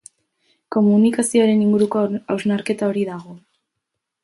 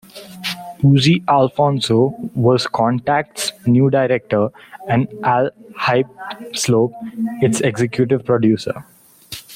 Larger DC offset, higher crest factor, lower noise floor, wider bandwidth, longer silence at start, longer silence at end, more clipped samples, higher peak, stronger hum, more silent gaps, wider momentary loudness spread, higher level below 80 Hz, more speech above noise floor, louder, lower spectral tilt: neither; about the same, 14 dB vs 14 dB; first, -79 dBFS vs -37 dBFS; second, 11.5 kHz vs 16 kHz; first, 0.7 s vs 0.15 s; first, 0.85 s vs 0 s; neither; about the same, -4 dBFS vs -2 dBFS; neither; neither; second, 9 LU vs 12 LU; second, -64 dBFS vs -54 dBFS; first, 62 dB vs 20 dB; about the same, -18 LUFS vs -17 LUFS; about the same, -6 dB/octave vs -6 dB/octave